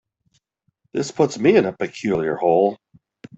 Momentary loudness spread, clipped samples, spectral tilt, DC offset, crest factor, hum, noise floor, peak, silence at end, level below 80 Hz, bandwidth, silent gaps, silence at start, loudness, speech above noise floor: 10 LU; under 0.1%; -6 dB/octave; under 0.1%; 18 dB; none; -69 dBFS; -2 dBFS; 0.65 s; -60 dBFS; 8.2 kHz; none; 0.95 s; -20 LUFS; 50 dB